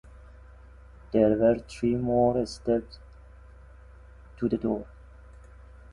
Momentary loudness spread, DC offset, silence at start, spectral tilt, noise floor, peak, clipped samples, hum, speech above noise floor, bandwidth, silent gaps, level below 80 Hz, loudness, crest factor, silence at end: 13 LU; under 0.1%; 0.15 s; -7.5 dB/octave; -49 dBFS; -8 dBFS; under 0.1%; none; 24 dB; 11.5 kHz; none; -48 dBFS; -26 LUFS; 20 dB; 1 s